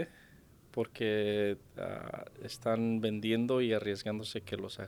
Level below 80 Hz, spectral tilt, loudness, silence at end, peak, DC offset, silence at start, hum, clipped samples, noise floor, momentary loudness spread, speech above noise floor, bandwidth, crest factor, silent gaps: -66 dBFS; -6 dB/octave; -34 LUFS; 0 s; -18 dBFS; under 0.1%; 0 s; none; under 0.1%; -60 dBFS; 12 LU; 26 dB; 17.5 kHz; 16 dB; none